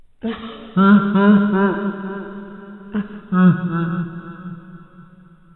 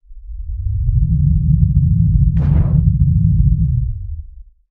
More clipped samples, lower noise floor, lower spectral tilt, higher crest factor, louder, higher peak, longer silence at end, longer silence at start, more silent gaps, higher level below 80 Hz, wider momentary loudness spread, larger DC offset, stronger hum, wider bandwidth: neither; first, -46 dBFS vs -36 dBFS; second, -11.5 dB/octave vs -13 dB/octave; about the same, 18 dB vs 14 dB; about the same, -17 LUFS vs -15 LUFS; about the same, -2 dBFS vs 0 dBFS; first, 0.55 s vs 0.3 s; first, 0.25 s vs 0.1 s; neither; second, -54 dBFS vs -18 dBFS; first, 22 LU vs 15 LU; neither; neither; first, 4.1 kHz vs 2.3 kHz